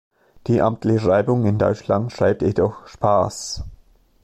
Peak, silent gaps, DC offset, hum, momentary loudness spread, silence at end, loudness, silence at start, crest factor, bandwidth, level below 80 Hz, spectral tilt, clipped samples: -4 dBFS; none; under 0.1%; none; 12 LU; 0.5 s; -20 LUFS; 0.45 s; 16 dB; 12 kHz; -44 dBFS; -7 dB/octave; under 0.1%